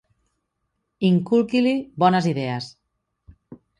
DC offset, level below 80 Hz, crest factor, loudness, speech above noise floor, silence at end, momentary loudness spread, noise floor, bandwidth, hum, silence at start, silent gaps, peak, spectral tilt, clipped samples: under 0.1%; -60 dBFS; 18 dB; -21 LUFS; 56 dB; 0.25 s; 10 LU; -76 dBFS; 10.5 kHz; none; 1 s; none; -4 dBFS; -7.5 dB/octave; under 0.1%